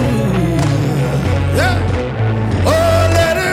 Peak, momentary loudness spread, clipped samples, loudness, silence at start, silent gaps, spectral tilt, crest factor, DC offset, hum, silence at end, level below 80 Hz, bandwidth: -2 dBFS; 5 LU; under 0.1%; -14 LUFS; 0 s; none; -6 dB/octave; 12 dB; under 0.1%; none; 0 s; -28 dBFS; 15.5 kHz